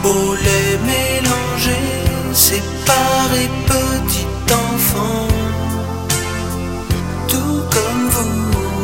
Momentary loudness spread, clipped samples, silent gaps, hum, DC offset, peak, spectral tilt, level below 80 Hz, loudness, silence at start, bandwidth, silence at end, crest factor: 7 LU; under 0.1%; none; none; 0.9%; 0 dBFS; -4 dB/octave; -28 dBFS; -16 LUFS; 0 s; 16.5 kHz; 0 s; 16 dB